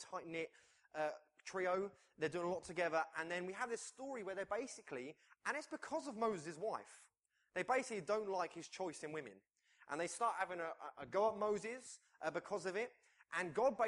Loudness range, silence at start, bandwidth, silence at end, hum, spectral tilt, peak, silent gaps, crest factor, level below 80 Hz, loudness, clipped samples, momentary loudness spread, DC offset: 3 LU; 0 s; 11.5 kHz; 0 s; none; -4 dB/octave; -24 dBFS; none; 20 dB; -82 dBFS; -43 LUFS; under 0.1%; 10 LU; under 0.1%